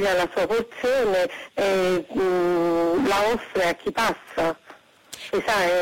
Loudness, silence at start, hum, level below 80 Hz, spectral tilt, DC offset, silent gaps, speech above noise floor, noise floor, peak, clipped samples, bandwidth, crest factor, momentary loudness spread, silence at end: -23 LUFS; 0 s; none; -52 dBFS; -4.5 dB/octave; under 0.1%; none; 27 dB; -50 dBFS; -14 dBFS; under 0.1%; 16.5 kHz; 8 dB; 6 LU; 0 s